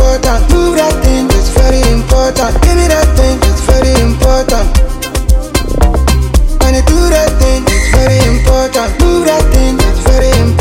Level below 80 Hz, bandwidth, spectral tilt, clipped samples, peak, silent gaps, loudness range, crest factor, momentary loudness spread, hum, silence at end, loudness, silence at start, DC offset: -10 dBFS; 16.5 kHz; -5 dB/octave; 0.1%; 0 dBFS; none; 1 LU; 8 dB; 4 LU; none; 0 s; -10 LUFS; 0 s; under 0.1%